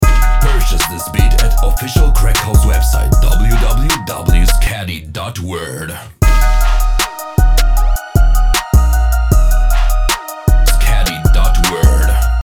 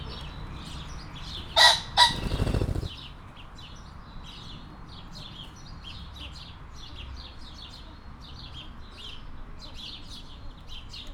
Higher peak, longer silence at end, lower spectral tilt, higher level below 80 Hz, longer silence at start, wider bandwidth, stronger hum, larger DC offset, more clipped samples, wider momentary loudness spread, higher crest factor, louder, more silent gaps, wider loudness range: about the same, 0 dBFS vs -2 dBFS; about the same, 0.05 s vs 0 s; first, -4.5 dB/octave vs -2.5 dB/octave; first, -10 dBFS vs -42 dBFS; about the same, 0 s vs 0 s; second, 17.5 kHz vs over 20 kHz; neither; neither; neither; second, 6 LU vs 25 LU; second, 10 dB vs 28 dB; first, -14 LUFS vs -23 LUFS; neither; second, 3 LU vs 19 LU